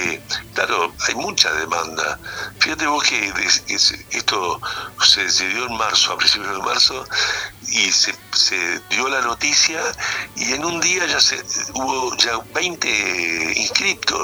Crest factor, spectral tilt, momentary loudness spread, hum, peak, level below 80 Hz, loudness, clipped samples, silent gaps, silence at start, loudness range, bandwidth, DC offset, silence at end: 20 dB; 0 dB/octave; 8 LU; none; 0 dBFS; -50 dBFS; -17 LUFS; under 0.1%; none; 0 s; 2 LU; over 20 kHz; under 0.1%; 0 s